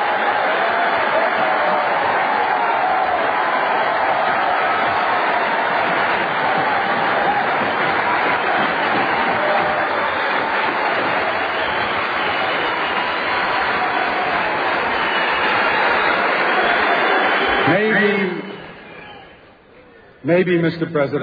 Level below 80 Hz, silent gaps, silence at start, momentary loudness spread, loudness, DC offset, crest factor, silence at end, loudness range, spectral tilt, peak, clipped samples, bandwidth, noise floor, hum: -54 dBFS; none; 0 s; 4 LU; -17 LUFS; under 0.1%; 14 dB; 0 s; 3 LU; -6.5 dB/octave; -4 dBFS; under 0.1%; 5 kHz; -46 dBFS; none